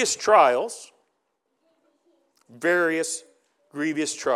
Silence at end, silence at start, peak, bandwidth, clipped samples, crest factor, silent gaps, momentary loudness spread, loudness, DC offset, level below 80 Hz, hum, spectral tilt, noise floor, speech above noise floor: 0 s; 0 s; -4 dBFS; 14.5 kHz; under 0.1%; 22 dB; none; 16 LU; -22 LUFS; under 0.1%; -76 dBFS; none; -2.5 dB/octave; -75 dBFS; 53 dB